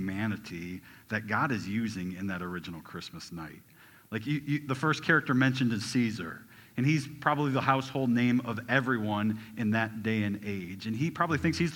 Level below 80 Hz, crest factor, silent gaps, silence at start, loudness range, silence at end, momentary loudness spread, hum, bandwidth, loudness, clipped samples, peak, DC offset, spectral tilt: -62 dBFS; 22 dB; none; 0 s; 6 LU; 0 s; 15 LU; none; 19 kHz; -30 LUFS; under 0.1%; -8 dBFS; under 0.1%; -6 dB/octave